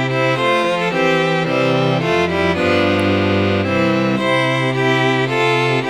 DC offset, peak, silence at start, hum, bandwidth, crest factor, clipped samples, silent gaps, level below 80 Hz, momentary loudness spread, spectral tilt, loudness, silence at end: under 0.1%; -2 dBFS; 0 s; none; 13.5 kHz; 14 dB; under 0.1%; none; -48 dBFS; 2 LU; -6 dB/octave; -16 LUFS; 0 s